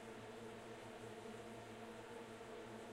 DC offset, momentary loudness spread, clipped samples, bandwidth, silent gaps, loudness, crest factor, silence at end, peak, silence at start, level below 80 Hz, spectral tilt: under 0.1%; 1 LU; under 0.1%; 16 kHz; none; -54 LUFS; 12 dB; 0 s; -42 dBFS; 0 s; -76 dBFS; -4.5 dB/octave